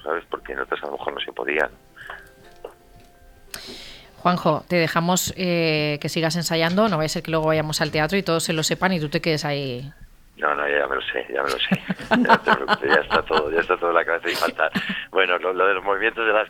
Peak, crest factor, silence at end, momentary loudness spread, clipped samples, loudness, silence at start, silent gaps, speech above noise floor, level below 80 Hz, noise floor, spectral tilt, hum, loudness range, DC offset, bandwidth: -2 dBFS; 22 dB; 0 s; 12 LU; under 0.1%; -22 LUFS; 0 s; none; 28 dB; -50 dBFS; -50 dBFS; -4 dB/octave; none; 9 LU; under 0.1%; 17.5 kHz